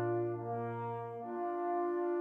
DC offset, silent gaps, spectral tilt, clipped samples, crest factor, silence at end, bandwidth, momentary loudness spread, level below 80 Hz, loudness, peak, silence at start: under 0.1%; none; -11 dB/octave; under 0.1%; 10 dB; 0 s; 3.4 kHz; 6 LU; -80 dBFS; -38 LUFS; -26 dBFS; 0 s